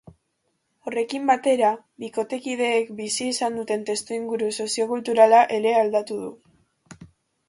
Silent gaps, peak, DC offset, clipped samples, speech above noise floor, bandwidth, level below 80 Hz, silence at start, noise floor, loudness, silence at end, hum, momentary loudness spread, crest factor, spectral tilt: none; -2 dBFS; under 0.1%; under 0.1%; 51 dB; 11.5 kHz; -68 dBFS; 0.85 s; -73 dBFS; -22 LUFS; 0.45 s; none; 14 LU; 22 dB; -3 dB/octave